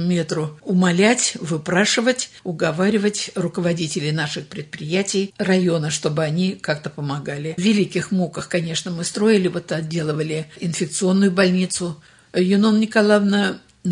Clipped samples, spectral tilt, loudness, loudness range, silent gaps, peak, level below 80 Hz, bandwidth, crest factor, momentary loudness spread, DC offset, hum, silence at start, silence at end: under 0.1%; -5 dB/octave; -20 LUFS; 3 LU; none; -2 dBFS; -62 dBFS; 11 kHz; 18 dB; 10 LU; under 0.1%; none; 0 s; 0 s